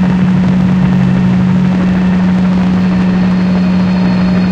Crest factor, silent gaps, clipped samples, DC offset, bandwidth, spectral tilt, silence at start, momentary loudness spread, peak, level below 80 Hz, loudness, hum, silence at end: 10 dB; none; under 0.1%; under 0.1%; 6.8 kHz; -8.5 dB/octave; 0 s; 1 LU; 0 dBFS; -30 dBFS; -10 LUFS; none; 0 s